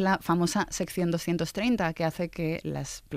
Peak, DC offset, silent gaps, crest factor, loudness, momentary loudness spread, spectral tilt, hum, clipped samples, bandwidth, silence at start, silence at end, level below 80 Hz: -14 dBFS; under 0.1%; none; 16 dB; -29 LUFS; 6 LU; -5 dB/octave; none; under 0.1%; 15.5 kHz; 0 s; 0 s; -52 dBFS